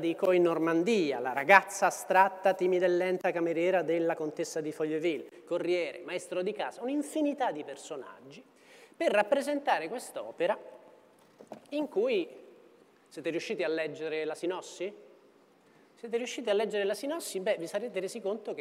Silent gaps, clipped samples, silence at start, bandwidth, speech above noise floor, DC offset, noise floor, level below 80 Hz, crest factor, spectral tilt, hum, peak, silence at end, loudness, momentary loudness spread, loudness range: none; under 0.1%; 0 s; 16 kHz; 32 dB; under 0.1%; -62 dBFS; under -90 dBFS; 24 dB; -4.5 dB/octave; none; -6 dBFS; 0 s; -30 LUFS; 13 LU; 9 LU